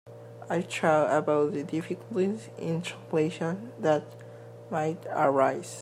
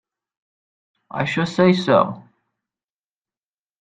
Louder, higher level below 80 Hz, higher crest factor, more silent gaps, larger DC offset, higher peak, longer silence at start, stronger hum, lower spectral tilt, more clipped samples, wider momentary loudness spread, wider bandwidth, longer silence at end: second, -28 LUFS vs -18 LUFS; second, -76 dBFS vs -62 dBFS; about the same, 18 dB vs 22 dB; neither; neither; second, -10 dBFS vs -2 dBFS; second, 0.05 s vs 1.15 s; neither; about the same, -6 dB/octave vs -6.5 dB/octave; neither; about the same, 17 LU vs 15 LU; first, 15 kHz vs 9 kHz; second, 0 s vs 1.6 s